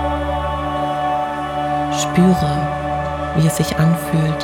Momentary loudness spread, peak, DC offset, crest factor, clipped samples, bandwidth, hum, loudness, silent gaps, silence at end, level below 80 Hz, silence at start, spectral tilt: 7 LU; -2 dBFS; under 0.1%; 16 dB; under 0.1%; 17.5 kHz; none; -18 LUFS; none; 0 s; -34 dBFS; 0 s; -6 dB/octave